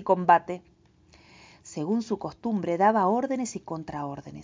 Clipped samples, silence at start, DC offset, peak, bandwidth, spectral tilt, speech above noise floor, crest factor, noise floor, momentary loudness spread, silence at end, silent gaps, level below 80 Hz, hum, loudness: under 0.1%; 0 s; under 0.1%; -6 dBFS; 7.8 kHz; -6 dB/octave; 32 dB; 22 dB; -58 dBFS; 15 LU; 0 s; none; -62 dBFS; none; -26 LUFS